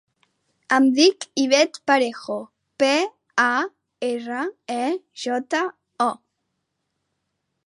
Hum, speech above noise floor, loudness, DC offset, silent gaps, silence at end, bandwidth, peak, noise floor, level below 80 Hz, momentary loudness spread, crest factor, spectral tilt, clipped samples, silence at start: none; 56 dB; -22 LUFS; under 0.1%; none; 1.5 s; 11.5 kHz; -4 dBFS; -77 dBFS; -80 dBFS; 12 LU; 20 dB; -2 dB/octave; under 0.1%; 0.7 s